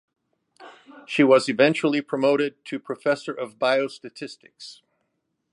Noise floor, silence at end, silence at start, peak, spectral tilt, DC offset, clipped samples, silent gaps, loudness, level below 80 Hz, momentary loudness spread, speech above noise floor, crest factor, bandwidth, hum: -76 dBFS; 0.8 s; 0.6 s; -4 dBFS; -5 dB/octave; under 0.1%; under 0.1%; none; -22 LUFS; -76 dBFS; 21 LU; 53 dB; 20 dB; 11.5 kHz; none